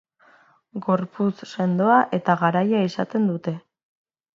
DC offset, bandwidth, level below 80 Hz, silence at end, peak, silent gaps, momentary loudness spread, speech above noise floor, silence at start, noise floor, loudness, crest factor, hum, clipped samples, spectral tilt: under 0.1%; 7.6 kHz; -70 dBFS; 0.75 s; -4 dBFS; none; 13 LU; 35 dB; 0.75 s; -56 dBFS; -22 LUFS; 18 dB; none; under 0.1%; -8 dB/octave